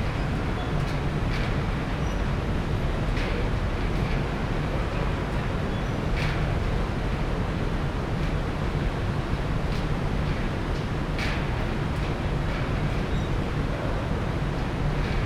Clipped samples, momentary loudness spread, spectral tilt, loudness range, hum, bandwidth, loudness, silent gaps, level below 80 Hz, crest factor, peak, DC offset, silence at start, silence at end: under 0.1%; 1 LU; -7 dB/octave; 1 LU; none; 12.5 kHz; -28 LUFS; none; -30 dBFS; 12 dB; -14 dBFS; under 0.1%; 0 s; 0 s